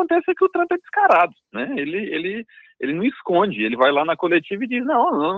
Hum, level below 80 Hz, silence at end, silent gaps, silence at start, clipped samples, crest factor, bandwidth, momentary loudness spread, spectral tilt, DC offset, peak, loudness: none; -66 dBFS; 0 s; none; 0 s; under 0.1%; 18 dB; 5.4 kHz; 10 LU; -7.5 dB/octave; under 0.1%; -2 dBFS; -20 LUFS